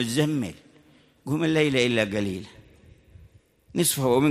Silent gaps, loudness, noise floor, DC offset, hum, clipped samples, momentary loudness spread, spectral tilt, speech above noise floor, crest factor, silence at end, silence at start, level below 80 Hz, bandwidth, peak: none; -24 LUFS; -57 dBFS; under 0.1%; none; under 0.1%; 15 LU; -4.5 dB/octave; 34 dB; 18 dB; 0 s; 0 s; -58 dBFS; 15.5 kHz; -8 dBFS